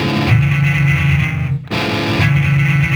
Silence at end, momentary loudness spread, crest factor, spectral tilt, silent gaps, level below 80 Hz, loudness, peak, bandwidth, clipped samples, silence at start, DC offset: 0 s; 5 LU; 14 dB; -6.5 dB/octave; none; -32 dBFS; -14 LUFS; 0 dBFS; 14 kHz; under 0.1%; 0 s; under 0.1%